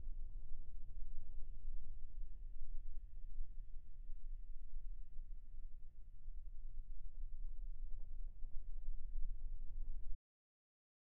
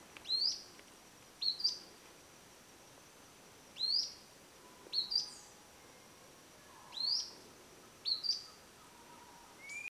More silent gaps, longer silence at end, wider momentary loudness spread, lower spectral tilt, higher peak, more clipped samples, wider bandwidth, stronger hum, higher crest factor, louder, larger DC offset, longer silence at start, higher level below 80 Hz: neither; first, 1 s vs 0 s; second, 6 LU vs 24 LU; first, -11.5 dB/octave vs 0.5 dB/octave; second, -26 dBFS vs -22 dBFS; neither; second, 0.4 kHz vs 16 kHz; neither; second, 12 dB vs 22 dB; second, -57 LUFS vs -36 LUFS; neither; about the same, 0 s vs 0 s; first, -46 dBFS vs -78 dBFS